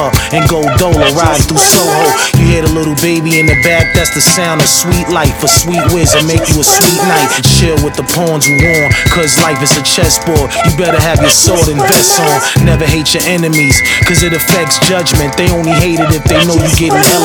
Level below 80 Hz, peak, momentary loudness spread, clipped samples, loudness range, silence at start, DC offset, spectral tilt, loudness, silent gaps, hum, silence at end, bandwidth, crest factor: -22 dBFS; 0 dBFS; 5 LU; 0.8%; 1 LU; 0 s; under 0.1%; -3.5 dB/octave; -8 LUFS; none; none; 0 s; over 20 kHz; 8 dB